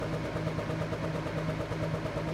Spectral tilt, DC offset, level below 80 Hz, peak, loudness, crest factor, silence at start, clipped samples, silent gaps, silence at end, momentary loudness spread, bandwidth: -7 dB/octave; under 0.1%; -48 dBFS; -18 dBFS; -34 LUFS; 14 dB; 0 s; under 0.1%; none; 0 s; 1 LU; 13 kHz